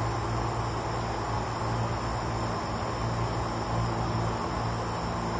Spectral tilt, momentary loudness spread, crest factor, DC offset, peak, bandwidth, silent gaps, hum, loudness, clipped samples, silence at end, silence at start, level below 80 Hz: -6 dB/octave; 2 LU; 12 dB; under 0.1%; -18 dBFS; 8 kHz; none; none; -31 LUFS; under 0.1%; 0 s; 0 s; -40 dBFS